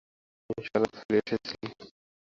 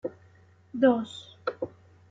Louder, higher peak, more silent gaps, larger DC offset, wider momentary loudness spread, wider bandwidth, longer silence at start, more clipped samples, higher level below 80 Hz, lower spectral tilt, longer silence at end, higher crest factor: second, -31 LUFS vs -28 LUFS; about the same, -10 dBFS vs -10 dBFS; first, 1.05-1.09 s vs none; neither; second, 13 LU vs 16 LU; about the same, 7.6 kHz vs 7.8 kHz; first, 0.5 s vs 0.05 s; neither; first, -64 dBFS vs -72 dBFS; about the same, -6 dB/octave vs -6 dB/octave; about the same, 0.35 s vs 0.45 s; about the same, 22 dB vs 20 dB